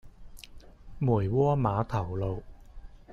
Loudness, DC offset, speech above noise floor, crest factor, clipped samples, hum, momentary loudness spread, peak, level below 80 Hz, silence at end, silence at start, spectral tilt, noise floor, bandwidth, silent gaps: -29 LUFS; under 0.1%; 21 dB; 16 dB; under 0.1%; none; 25 LU; -14 dBFS; -48 dBFS; 0 s; 0.05 s; -9 dB/octave; -48 dBFS; 12.5 kHz; none